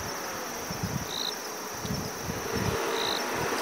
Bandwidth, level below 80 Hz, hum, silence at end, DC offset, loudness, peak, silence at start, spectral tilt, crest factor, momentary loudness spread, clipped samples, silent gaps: 16 kHz; -52 dBFS; none; 0 s; under 0.1%; -31 LUFS; -16 dBFS; 0 s; -3 dB/octave; 16 dB; 6 LU; under 0.1%; none